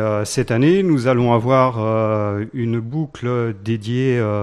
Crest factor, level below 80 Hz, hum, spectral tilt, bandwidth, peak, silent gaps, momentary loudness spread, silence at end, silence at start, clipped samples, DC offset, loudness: 16 dB; -50 dBFS; none; -7 dB/octave; 12.5 kHz; -2 dBFS; none; 8 LU; 0 s; 0 s; under 0.1%; under 0.1%; -18 LUFS